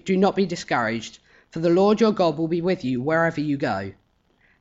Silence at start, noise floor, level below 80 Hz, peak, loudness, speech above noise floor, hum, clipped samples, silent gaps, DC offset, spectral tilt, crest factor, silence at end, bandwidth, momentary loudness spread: 0.05 s; -63 dBFS; -58 dBFS; -8 dBFS; -22 LUFS; 41 dB; none; under 0.1%; none; under 0.1%; -6.5 dB/octave; 16 dB; 0.7 s; 8 kHz; 12 LU